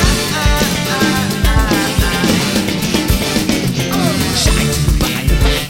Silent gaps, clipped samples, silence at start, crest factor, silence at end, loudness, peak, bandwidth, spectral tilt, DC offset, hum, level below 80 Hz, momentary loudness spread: none; under 0.1%; 0 s; 12 dB; 0 s; -14 LUFS; 0 dBFS; 16.5 kHz; -4 dB/octave; under 0.1%; none; -20 dBFS; 2 LU